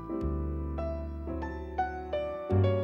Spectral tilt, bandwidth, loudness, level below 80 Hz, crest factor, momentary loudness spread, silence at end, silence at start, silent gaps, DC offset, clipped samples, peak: -9.5 dB/octave; 5.8 kHz; -34 LUFS; -40 dBFS; 16 dB; 8 LU; 0 s; 0 s; none; under 0.1%; under 0.1%; -16 dBFS